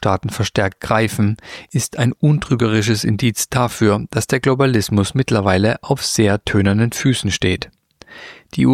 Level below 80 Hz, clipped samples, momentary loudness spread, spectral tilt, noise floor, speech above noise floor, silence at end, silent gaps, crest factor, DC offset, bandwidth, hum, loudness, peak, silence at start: -44 dBFS; under 0.1%; 7 LU; -5.5 dB/octave; -41 dBFS; 24 dB; 0 s; none; 16 dB; under 0.1%; 16 kHz; none; -17 LUFS; -2 dBFS; 0 s